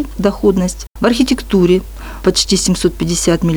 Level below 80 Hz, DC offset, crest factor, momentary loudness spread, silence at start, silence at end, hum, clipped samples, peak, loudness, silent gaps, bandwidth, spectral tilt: -30 dBFS; under 0.1%; 12 dB; 5 LU; 0 s; 0 s; none; under 0.1%; 0 dBFS; -14 LUFS; 0.87-0.91 s; over 20 kHz; -4.5 dB/octave